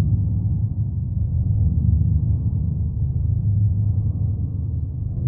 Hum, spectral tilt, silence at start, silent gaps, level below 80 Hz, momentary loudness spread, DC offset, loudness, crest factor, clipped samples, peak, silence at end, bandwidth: none; -16.5 dB/octave; 0 s; none; -26 dBFS; 6 LU; under 0.1%; -22 LUFS; 12 dB; under 0.1%; -8 dBFS; 0 s; 1.1 kHz